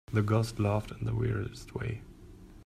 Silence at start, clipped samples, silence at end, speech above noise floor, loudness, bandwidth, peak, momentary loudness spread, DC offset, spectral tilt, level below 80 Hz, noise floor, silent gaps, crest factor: 0.1 s; under 0.1%; 0 s; 20 dB; -32 LUFS; 13 kHz; -14 dBFS; 11 LU; under 0.1%; -7.5 dB/octave; -50 dBFS; -51 dBFS; none; 18 dB